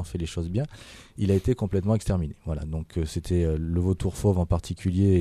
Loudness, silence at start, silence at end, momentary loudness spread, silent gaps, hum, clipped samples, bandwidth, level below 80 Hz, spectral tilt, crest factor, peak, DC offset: -27 LUFS; 0 s; 0 s; 8 LU; none; none; under 0.1%; 13 kHz; -38 dBFS; -7.5 dB/octave; 16 dB; -10 dBFS; under 0.1%